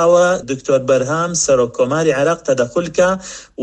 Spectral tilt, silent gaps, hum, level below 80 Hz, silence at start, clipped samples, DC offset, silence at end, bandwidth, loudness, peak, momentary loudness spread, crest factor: -4.5 dB/octave; none; none; -48 dBFS; 0 s; under 0.1%; under 0.1%; 0 s; 9.8 kHz; -15 LUFS; -2 dBFS; 4 LU; 14 dB